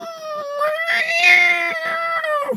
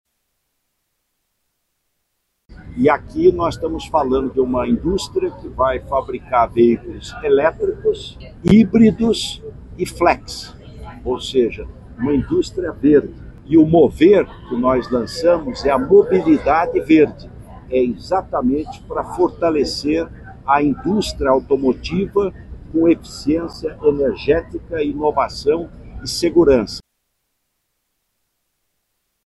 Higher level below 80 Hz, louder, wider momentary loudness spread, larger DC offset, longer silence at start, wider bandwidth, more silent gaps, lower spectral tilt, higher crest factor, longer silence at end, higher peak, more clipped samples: second, -86 dBFS vs -38 dBFS; about the same, -15 LUFS vs -17 LUFS; about the same, 16 LU vs 14 LU; neither; second, 0 s vs 2.5 s; first, 15.5 kHz vs 12.5 kHz; neither; second, -1 dB/octave vs -6.5 dB/octave; about the same, 18 dB vs 16 dB; second, 0 s vs 2.5 s; about the same, -2 dBFS vs -2 dBFS; neither